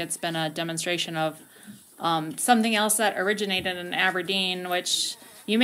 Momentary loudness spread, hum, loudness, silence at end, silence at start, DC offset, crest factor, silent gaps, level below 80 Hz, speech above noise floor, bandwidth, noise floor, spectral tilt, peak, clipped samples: 8 LU; none; -25 LUFS; 0 s; 0 s; under 0.1%; 22 dB; none; -70 dBFS; 22 dB; 16 kHz; -48 dBFS; -2.5 dB/octave; -6 dBFS; under 0.1%